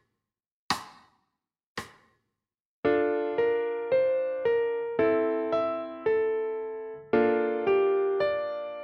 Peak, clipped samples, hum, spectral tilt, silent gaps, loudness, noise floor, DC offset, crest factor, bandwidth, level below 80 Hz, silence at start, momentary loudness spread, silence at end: -12 dBFS; under 0.1%; none; -5 dB/octave; 1.66-1.75 s, 2.60-2.83 s; -27 LUFS; -85 dBFS; under 0.1%; 18 dB; 12.5 kHz; -66 dBFS; 0.7 s; 11 LU; 0 s